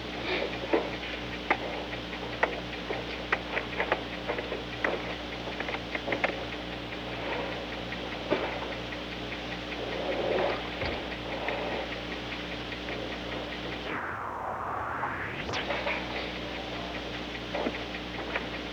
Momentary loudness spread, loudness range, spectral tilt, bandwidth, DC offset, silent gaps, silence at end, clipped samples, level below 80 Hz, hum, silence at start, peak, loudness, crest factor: 6 LU; 2 LU; -5 dB/octave; over 20 kHz; under 0.1%; none; 0 s; under 0.1%; -48 dBFS; 60 Hz at -45 dBFS; 0 s; -10 dBFS; -33 LUFS; 22 dB